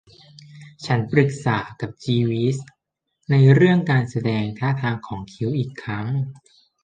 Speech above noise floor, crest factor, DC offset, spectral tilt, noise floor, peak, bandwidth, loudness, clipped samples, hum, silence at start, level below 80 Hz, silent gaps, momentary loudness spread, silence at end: 54 dB; 20 dB; under 0.1%; -7.5 dB/octave; -74 dBFS; -2 dBFS; 9 kHz; -21 LUFS; under 0.1%; none; 0.55 s; -56 dBFS; none; 15 LU; 0.5 s